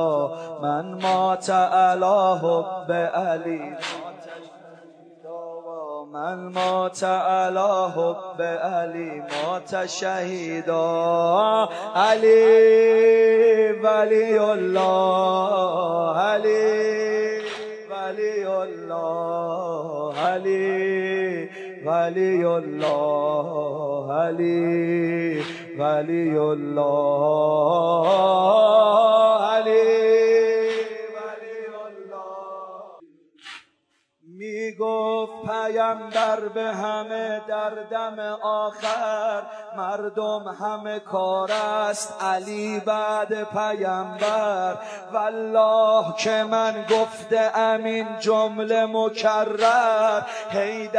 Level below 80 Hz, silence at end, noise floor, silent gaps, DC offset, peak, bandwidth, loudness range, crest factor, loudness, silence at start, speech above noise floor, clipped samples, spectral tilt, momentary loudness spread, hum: -84 dBFS; 0 s; -69 dBFS; none; under 0.1%; -6 dBFS; 10.5 kHz; 10 LU; 16 dB; -22 LUFS; 0 s; 48 dB; under 0.1%; -5 dB/octave; 14 LU; none